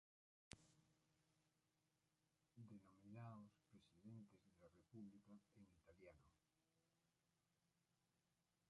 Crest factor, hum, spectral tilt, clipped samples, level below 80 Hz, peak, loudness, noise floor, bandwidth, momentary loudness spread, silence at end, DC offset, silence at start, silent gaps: 34 dB; none; -6 dB/octave; under 0.1%; -88 dBFS; -34 dBFS; -65 LUFS; -89 dBFS; 10 kHz; 8 LU; 0 s; under 0.1%; 0.5 s; none